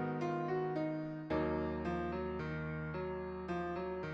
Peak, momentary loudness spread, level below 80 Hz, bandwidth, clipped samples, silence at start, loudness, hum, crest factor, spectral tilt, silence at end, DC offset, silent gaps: -24 dBFS; 4 LU; -56 dBFS; 7.4 kHz; under 0.1%; 0 s; -39 LUFS; none; 14 dB; -8.5 dB/octave; 0 s; under 0.1%; none